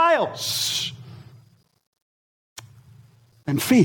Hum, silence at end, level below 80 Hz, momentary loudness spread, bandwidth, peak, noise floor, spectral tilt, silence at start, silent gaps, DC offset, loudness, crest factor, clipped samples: none; 0 s; -64 dBFS; 25 LU; 19 kHz; -6 dBFS; -56 dBFS; -4 dB/octave; 0 s; 1.87-1.93 s, 2.02-2.56 s; under 0.1%; -23 LUFS; 20 dB; under 0.1%